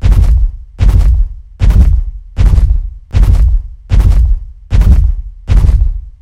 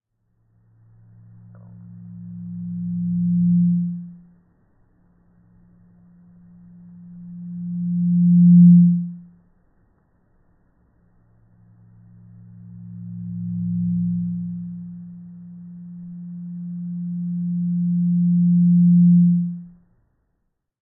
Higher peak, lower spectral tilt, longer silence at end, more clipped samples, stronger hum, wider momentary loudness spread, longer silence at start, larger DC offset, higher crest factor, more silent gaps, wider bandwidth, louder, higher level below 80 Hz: first, 0 dBFS vs -4 dBFS; second, -8 dB/octave vs -18 dB/octave; second, 0.1 s vs 1.15 s; first, 2% vs under 0.1%; neither; second, 9 LU vs 25 LU; second, 0 s vs 1.85 s; first, 0.8% vs under 0.1%; second, 8 dB vs 16 dB; neither; first, 6.4 kHz vs 0.3 kHz; first, -12 LUFS vs -18 LUFS; first, -10 dBFS vs -62 dBFS